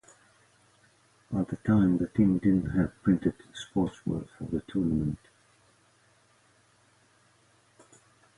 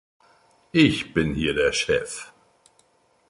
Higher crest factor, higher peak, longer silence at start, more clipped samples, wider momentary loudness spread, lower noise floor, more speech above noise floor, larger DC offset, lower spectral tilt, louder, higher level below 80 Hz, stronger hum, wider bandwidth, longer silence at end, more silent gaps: about the same, 18 dB vs 20 dB; second, -12 dBFS vs -6 dBFS; first, 1.3 s vs 0.75 s; neither; second, 11 LU vs 16 LU; about the same, -64 dBFS vs -62 dBFS; second, 37 dB vs 41 dB; neither; first, -8.5 dB/octave vs -4.5 dB/octave; second, -28 LUFS vs -22 LUFS; second, -52 dBFS vs -46 dBFS; neither; about the same, 11.5 kHz vs 11.5 kHz; first, 3.2 s vs 1.05 s; neither